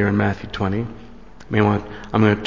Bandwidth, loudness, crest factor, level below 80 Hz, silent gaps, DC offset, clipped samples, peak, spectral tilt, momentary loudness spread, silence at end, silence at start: 7.2 kHz; -21 LUFS; 18 dB; -40 dBFS; none; 0.8%; under 0.1%; -2 dBFS; -8 dB/octave; 9 LU; 0 s; 0 s